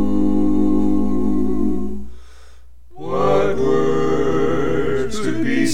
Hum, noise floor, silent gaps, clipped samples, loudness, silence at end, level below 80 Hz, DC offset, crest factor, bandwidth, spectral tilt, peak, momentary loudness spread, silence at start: none; -46 dBFS; none; under 0.1%; -19 LUFS; 0 s; -34 dBFS; 10%; 14 dB; 13 kHz; -6.5 dB/octave; -4 dBFS; 7 LU; 0 s